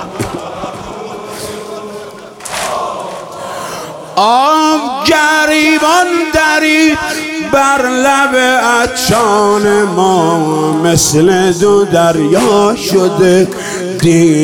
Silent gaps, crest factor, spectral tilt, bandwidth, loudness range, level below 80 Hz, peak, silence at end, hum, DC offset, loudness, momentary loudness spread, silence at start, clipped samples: none; 10 dB; -4 dB/octave; 18 kHz; 11 LU; -40 dBFS; 0 dBFS; 0 s; none; under 0.1%; -10 LUFS; 15 LU; 0 s; under 0.1%